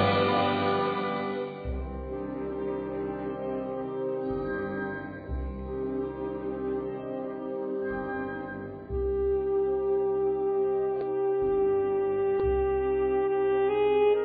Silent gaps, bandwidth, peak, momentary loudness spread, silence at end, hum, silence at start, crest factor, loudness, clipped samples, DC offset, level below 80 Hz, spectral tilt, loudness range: none; 4.8 kHz; -12 dBFS; 10 LU; 0 s; none; 0 s; 16 dB; -29 LUFS; under 0.1%; under 0.1%; -44 dBFS; -9.5 dB/octave; 7 LU